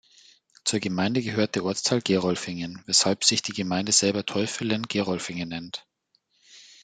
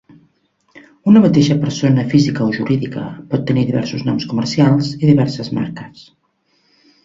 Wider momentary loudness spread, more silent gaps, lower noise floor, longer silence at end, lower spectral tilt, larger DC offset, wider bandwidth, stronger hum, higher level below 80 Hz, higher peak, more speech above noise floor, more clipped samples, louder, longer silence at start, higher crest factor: about the same, 12 LU vs 11 LU; neither; first, -70 dBFS vs -62 dBFS; second, 0.2 s vs 1.05 s; second, -3 dB/octave vs -7 dB/octave; neither; first, 10 kHz vs 7.8 kHz; neither; second, -66 dBFS vs -52 dBFS; about the same, -2 dBFS vs 0 dBFS; about the same, 44 dB vs 47 dB; neither; second, -25 LUFS vs -15 LUFS; about the same, 0.65 s vs 0.75 s; first, 24 dB vs 16 dB